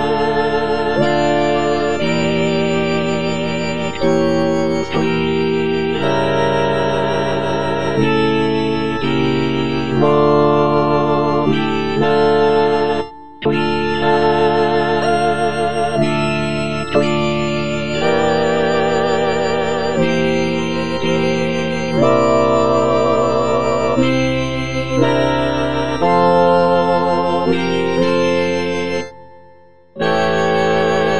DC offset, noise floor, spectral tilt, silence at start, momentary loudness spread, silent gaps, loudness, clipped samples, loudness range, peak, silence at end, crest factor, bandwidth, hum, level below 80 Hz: 3%; -47 dBFS; -6 dB/octave; 0 s; 5 LU; none; -16 LUFS; under 0.1%; 2 LU; 0 dBFS; 0 s; 14 dB; 10 kHz; none; -40 dBFS